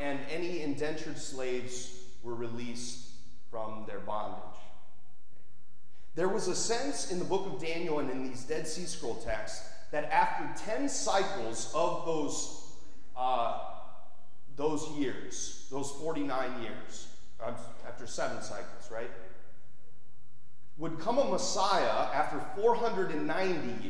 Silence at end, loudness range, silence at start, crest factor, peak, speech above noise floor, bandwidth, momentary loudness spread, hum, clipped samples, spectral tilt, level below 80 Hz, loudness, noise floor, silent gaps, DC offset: 0 s; 10 LU; 0 s; 22 dB; -12 dBFS; 33 dB; 11 kHz; 16 LU; none; under 0.1%; -3.5 dB/octave; -60 dBFS; -34 LUFS; -67 dBFS; none; 3%